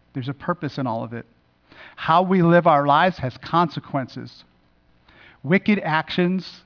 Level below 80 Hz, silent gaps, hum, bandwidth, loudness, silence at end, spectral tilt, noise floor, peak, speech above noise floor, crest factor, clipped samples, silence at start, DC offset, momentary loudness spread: -58 dBFS; none; none; 5.4 kHz; -20 LUFS; 0.1 s; -8 dB/octave; -59 dBFS; -6 dBFS; 38 dB; 16 dB; under 0.1%; 0.15 s; under 0.1%; 18 LU